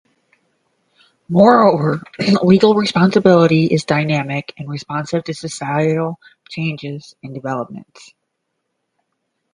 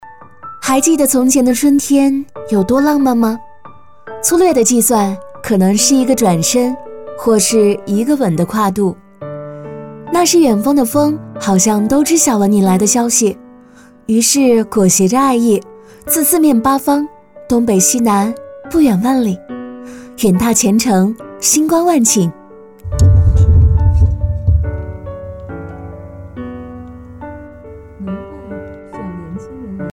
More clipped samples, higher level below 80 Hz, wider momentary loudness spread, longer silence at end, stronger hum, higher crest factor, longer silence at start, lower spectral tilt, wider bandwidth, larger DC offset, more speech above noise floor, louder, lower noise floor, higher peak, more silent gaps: neither; second, -56 dBFS vs -26 dBFS; about the same, 18 LU vs 19 LU; first, 1.7 s vs 0 s; neither; about the same, 16 dB vs 12 dB; first, 1.3 s vs 0.05 s; first, -6.5 dB/octave vs -5 dB/octave; second, 10.5 kHz vs 18 kHz; neither; first, 58 dB vs 30 dB; second, -15 LUFS vs -12 LUFS; first, -73 dBFS vs -42 dBFS; about the same, 0 dBFS vs -2 dBFS; neither